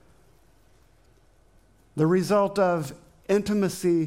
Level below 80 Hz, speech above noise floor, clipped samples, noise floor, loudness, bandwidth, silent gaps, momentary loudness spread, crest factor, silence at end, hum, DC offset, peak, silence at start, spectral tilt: -60 dBFS; 37 dB; under 0.1%; -60 dBFS; -24 LUFS; 16.5 kHz; none; 16 LU; 16 dB; 0 s; none; under 0.1%; -10 dBFS; 1.95 s; -6.5 dB/octave